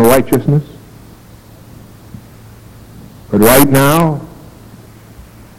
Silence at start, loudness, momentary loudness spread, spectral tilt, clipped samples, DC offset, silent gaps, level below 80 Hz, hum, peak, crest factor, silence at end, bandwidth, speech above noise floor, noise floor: 0 s; -11 LUFS; 18 LU; -5.5 dB/octave; 0.2%; under 0.1%; none; -38 dBFS; none; 0 dBFS; 14 dB; 0.3 s; over 20 kHz; 28 dB; -38 dBFS